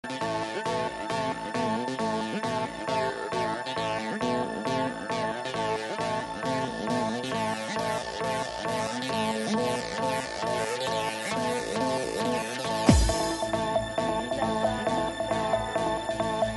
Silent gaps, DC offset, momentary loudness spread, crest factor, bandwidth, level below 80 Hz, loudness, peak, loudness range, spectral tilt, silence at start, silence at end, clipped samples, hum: none; under 0.1%; 3 LU; 24 dB; 11.5 kHz; -42 dBFS; -29 LUFS; -4 dBFS; 3 LU; -4.5 dB/octave; 0.05 s; 0 s; under 0.1%; none